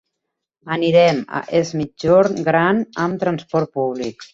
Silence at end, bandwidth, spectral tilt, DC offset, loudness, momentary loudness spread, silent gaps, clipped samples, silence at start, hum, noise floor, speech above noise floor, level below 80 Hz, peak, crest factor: 0.1 s; 7.6 kHz; -6.5 dB/octave; under 0.1%; -18 LUFS; 9 LU; none; under 0.1%; 0.65 s; none; -79 dBFS; 61 dB; -56 dBFS; -2 dBFS; 16 dB